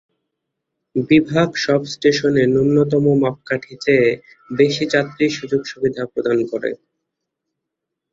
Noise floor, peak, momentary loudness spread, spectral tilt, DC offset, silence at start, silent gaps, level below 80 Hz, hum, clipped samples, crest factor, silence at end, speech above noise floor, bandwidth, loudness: -81 dBFS; -2 dBFS; 10 LU; -6 dB/octave; under 0.1%; 0.95 s; none; -54 dBFS; none; under 0.1%; 16 dB; 1.4 s; 63 dB; 7.8 kHz; -18 LUFS